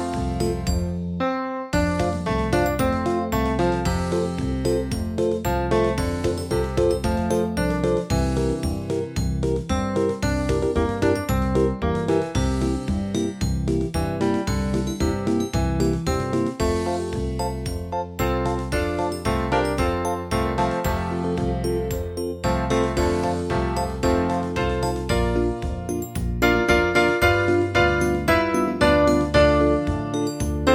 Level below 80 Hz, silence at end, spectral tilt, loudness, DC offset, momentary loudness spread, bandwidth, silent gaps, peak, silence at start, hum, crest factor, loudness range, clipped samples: -32 dBFS; 0 s; -6 dB/octave; -23 LUFS; under 0.1%; 7 LU; 16.5 kHz; none; -4 dBFS; 0 s; none; 18 dB; 5 LU; under 0.1%